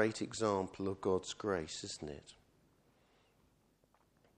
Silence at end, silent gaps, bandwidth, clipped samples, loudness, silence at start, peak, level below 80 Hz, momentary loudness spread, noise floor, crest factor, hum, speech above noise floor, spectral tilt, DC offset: 2.05 s; none; 11.5 kHz; under 0.1%; -39 LUFS; 0 s; -18 dBFS; -68 dBFS; 10 LU; -73 dBFS; 24 dB; none; 35 dB; -4.5 dB/octave; under 0.1%